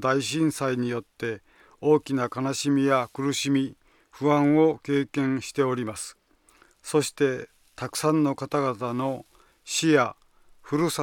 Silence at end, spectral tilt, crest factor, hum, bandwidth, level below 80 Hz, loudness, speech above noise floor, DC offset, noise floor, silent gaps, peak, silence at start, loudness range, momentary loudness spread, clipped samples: 0 s; -5 dB/octave; 18 dB; none; 17.5 kHz; -64 dBFS; -25 LUFS; 35 dB; under 0.1%; -60 dBFS; none; -8 dBFS; 0 s; 3 LU; 12 LU; under 0.1%